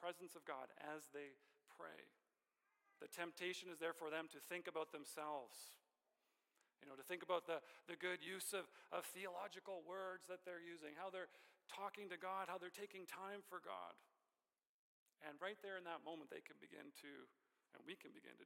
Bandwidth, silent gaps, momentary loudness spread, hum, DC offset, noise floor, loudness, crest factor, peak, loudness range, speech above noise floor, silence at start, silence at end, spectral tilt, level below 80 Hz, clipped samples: 16.5 kHz; 14.69-15.06 s; 13 LU; none; under 0.1%; under -90 dBFS; -52 LUFS; 22 dB; -30 dBFS; 7 LU; over 38 dB; 0 s; 0 s; -2.5 dB/octave; under -90 dBFS; under 0.1%